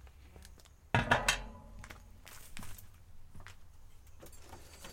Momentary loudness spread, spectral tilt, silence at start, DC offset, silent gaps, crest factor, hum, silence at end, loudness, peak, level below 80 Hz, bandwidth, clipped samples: 26 LU; -3.5 dB/octave; 0 s; under 0.1%; none; 28 dB; none; 0 s; -32 LUFS; -12 dBFS; -52 dBFS; 16.5 kHz; under 0.1%